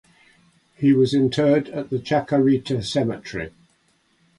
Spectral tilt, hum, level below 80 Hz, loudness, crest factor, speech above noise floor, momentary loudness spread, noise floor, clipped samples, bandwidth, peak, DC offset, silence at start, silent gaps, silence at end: -7 dB/octave; none; -54 dBFS; -21 LUFS; 14 dB; 43 dB; 13 LU; -63 dBFS; under 0.1%; 11.5 kHz; -6 dBFS; under 0.1%; 0.8 s; none; 0.9 s